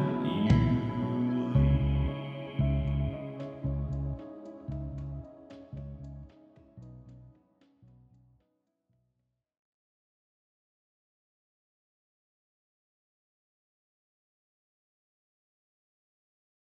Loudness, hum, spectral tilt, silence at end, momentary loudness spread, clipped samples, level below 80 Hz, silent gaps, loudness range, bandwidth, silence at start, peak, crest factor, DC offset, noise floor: -31 LUFS; none; -9.5 dB/octave; 9.3 s; 23 LU; under 0.1%; -42 dBFS; none; 21 LU; 6.4 kHz; 0 s; -10 dBFS; 24 dB; under 0.1%; -81 dBFS